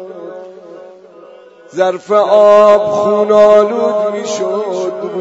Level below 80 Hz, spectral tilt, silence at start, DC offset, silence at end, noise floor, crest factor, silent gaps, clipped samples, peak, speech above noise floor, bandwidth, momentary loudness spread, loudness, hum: -58 dBFS; -5 dB/octave; 0 s; under 0.1%; 0 s; -38 dBFS; 12 dB; none; 0.4%; 0 dBFS; 28 dB; 8 kHz; 20 LU; -11 LUFS; none